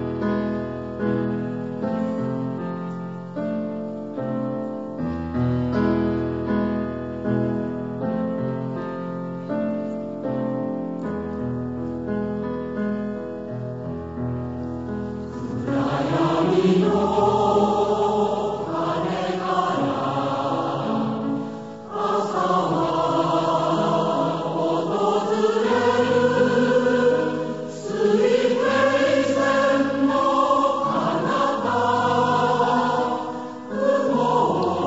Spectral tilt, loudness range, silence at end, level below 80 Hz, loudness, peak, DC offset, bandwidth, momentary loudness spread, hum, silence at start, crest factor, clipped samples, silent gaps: -6.5 dB/octave; 8 LU; 0 s; -50 dBFS; -23 LUFS; -6 dBFS; 0.2%; 8 kHz; 11 LU; none; 0 s; 16 dB; under 0.1%; none